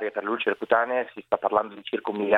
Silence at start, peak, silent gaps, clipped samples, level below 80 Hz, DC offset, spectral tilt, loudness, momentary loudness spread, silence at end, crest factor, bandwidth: 0 s; -4 dBFS; none; under 0.1%; -70 dBFS; under 0.1%; -6.5 dB/octave; -26 LUFS; 7 LU; 0 s; 20 dB; 4.5 kHz